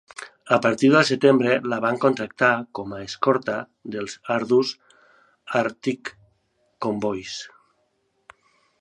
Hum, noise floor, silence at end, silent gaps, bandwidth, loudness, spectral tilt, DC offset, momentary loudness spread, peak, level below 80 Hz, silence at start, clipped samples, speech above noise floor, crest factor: none; -69 dBFS; 1.35 s; none; 11 kHz; -22 LUFS; -5 dB/octave; under 0.1%; 17 LU; -2 dBFS; -66 dBFS; 0.2 s; under 0.1%; 48 dB; 22 dB